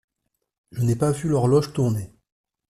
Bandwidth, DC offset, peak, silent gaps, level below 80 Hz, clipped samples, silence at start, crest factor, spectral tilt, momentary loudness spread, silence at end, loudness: 13.5 kHz; under 0.1%; -8 dBFS; none; -52 dBFS; under 0.1%; 0.75 s; 16 dB; -7.5 dB/octave; 14 LU; 0.65 s; -22 LUFS